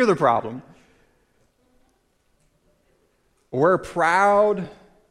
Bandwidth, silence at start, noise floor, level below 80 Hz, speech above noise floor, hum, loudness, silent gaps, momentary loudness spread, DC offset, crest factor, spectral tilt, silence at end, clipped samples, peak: 12.5 kHz; 0 s; -66 dBFS; -58 dBFS; 46 dB; none; -20 LUFS; none; 19 LU; under 0.1%; 18 dB; -6 dB/octave; 0.4 s; under 0.1%; -4 dBFS